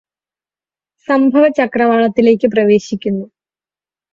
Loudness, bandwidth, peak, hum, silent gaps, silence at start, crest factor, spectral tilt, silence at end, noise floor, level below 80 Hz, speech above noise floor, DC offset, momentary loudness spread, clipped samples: -13 LUFS; 7.6 kHz; 0 dBFS; 50 Hz at -40 dBFS; none; 1.1 s; 14 dB; -6.5 dB/octave; 0.85 s; under -90 dBFS; -56 dBFS; over 78 dB; under 0.1%; 9 LU; under 0.1%